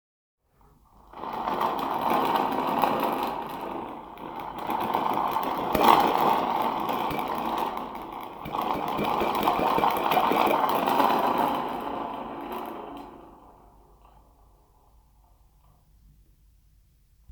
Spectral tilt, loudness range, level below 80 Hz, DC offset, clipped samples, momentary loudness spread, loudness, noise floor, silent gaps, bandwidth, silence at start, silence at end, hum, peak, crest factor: -5 dB/octave; 10 LU; -56 dBFS; under 0.1%; under 0.1%; 15 LU; -26 LUFS; -60 dBFS; none; over 20 kHz; 1.15 s; 3.8 s; none; 0 dBFS; 26 dB